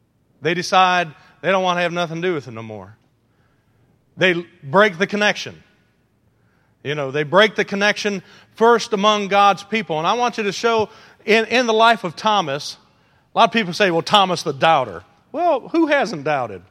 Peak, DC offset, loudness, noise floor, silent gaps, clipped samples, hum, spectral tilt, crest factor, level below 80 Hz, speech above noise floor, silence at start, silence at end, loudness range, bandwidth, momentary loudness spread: 0 dBFS; under 0.1%; -18 LUFS; -61 dBFS; none; under 0.1%; none; -4 dB/octave; 20 dB; -66 dBFS; 43 dB; 0.4 s; 0.1 s; 4 LU; 15 kHz; 13 LU